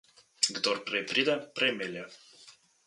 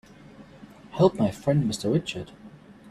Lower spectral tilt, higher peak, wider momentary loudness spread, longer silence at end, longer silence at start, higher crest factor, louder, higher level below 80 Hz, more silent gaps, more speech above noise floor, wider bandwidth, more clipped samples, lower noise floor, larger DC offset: second, -1.5 dB/octave vs -6.5 dB/octave; about the same, -8 dBFS vs -6 dBFS; second, 11 LU vs 16 LU; first, 0.35 s vs 0 s; about the same, 0.4 s vs 0.4 s; about the same, 24 dB vs 22 dB; second, -29 LUFS vs -25 LUFS; second, -80 dBFS vs -56 dBFS; neither; about the same, 26 dB vs 25 dB; second, 11.5 kHz vs 14 kHz; neither; first, -58 dBFS vs -48 dBFS; neither